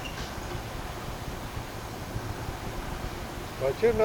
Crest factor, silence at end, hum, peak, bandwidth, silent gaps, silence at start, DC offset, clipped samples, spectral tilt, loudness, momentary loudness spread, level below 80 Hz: 20 dB; 0 s; none; -12 dBFS; over 20 kHz; none; 0 s; under 0.1%; under 0.1%; -5 dB/octave; -34 LUFS; 7 LU; -42 dBFS